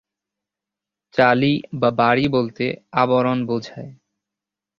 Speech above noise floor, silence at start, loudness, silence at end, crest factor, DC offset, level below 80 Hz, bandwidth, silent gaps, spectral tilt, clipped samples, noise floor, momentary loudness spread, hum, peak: 68 dB; 1.15 s; -19 LUFS; 0.85 s; 20 dB; under 0.1%; -58 dBFS; 7 kHz; none; -7.5 dB/octave; under 0.1%; -87 dBFS; 10 LU; none; 0 dBFS